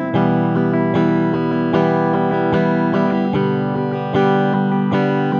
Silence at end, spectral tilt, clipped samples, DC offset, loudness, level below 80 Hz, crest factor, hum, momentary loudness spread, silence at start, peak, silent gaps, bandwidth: 0 s; -9 dB/octave; under 0.1%; under 0.1%; -17 LUFS; -52 dBFS; 14 dB; none; 2 LU; 0 s; -2 dBFS; none; 6.8 kHz